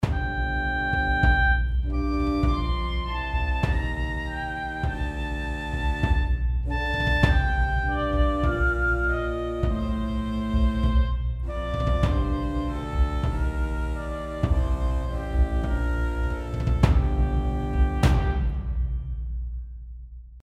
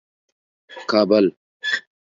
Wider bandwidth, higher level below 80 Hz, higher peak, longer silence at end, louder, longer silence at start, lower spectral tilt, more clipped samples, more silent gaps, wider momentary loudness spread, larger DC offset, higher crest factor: first, 8.6 kHz vs 7.6 kHz; first, -26 dBFS vs -68 dBFS; second, -6 dBFS vs -2 dBFS; second, 0.05 s vs 0.4 s; second, -26 LUFS vs -20 LUFS; second, 0 s vs 0.7 s; first, -7 dB/octave vs -5.5 dB/octave; neither; second, none vs 1.37-1.60 s; second, 9 LU vs 12 LU; neither; about the same, 18 dB vs 20 dB